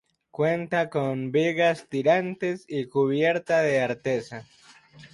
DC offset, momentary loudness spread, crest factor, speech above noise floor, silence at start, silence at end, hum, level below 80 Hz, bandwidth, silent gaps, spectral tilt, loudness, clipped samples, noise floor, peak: under 0.1%; 8 LU; 18 dB; 26 dB; 0.4 s; 0.1 s; none; -68 dBFS; 11.5 kHz; none; -6.5 dB/octave; -25 LUFS; under 0.1%; -51 dBFS; -8 dBFS